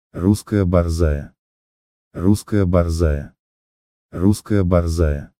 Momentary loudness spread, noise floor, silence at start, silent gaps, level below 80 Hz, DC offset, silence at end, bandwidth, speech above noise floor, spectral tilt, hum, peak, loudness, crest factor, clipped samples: 10 LU; under -90 dBFS; 0.15 s; 1.39-2.11 s, 3.39-4.09 s; -28 dBFS; under 0.1%; 0.15 s; 15 kHz; over 73 dB; -7.5 dB/octave; none; -2 dBFS; -19 LUFS; 18 dB; under 0.1%